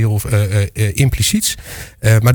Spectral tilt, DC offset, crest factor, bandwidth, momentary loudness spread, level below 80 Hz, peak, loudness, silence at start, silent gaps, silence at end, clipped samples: -4.5 dB/octave; under 0.1%; 14 dB; 19.5 kHz; 6 LU; -32 dBFS; 0 dBFS; -15 LUFS; 0 s; none; 0 s; under 0.1%